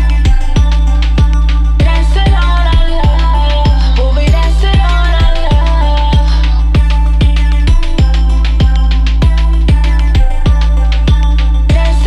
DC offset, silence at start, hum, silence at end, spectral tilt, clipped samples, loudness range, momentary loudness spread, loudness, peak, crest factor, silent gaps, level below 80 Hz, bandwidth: under 0.1%; 0 s; none; 0 s; -6.5 dB/octave; under 0.1%; 0 LU; 2 LU; -11 LUFS; 0 dBFS; 8 dB; none; -8 dBFS; 7.8 kHz